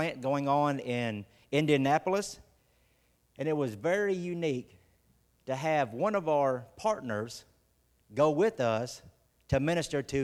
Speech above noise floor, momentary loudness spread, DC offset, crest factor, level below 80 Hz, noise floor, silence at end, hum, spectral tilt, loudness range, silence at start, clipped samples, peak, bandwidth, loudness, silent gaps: 40 dB; 14 LU; under 0.1%; 20 dB; -60 dBFS; -70 dBFS; 0 s; none; -6 dB/octave; 3 LU; 0 s; under 0.1%; -12 dBFS; 14.5 kHz; -31 LUFS; none